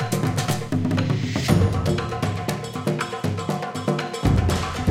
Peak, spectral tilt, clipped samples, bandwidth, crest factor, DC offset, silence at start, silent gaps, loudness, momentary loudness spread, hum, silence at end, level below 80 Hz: -4 dBFS; -6 dB/octave; under 0.1%; 16.5 kHz; 18 dB; under 0.1%; 0 s; none; -23 LUFS; 7 LU; none; 0 s; -36 dBFS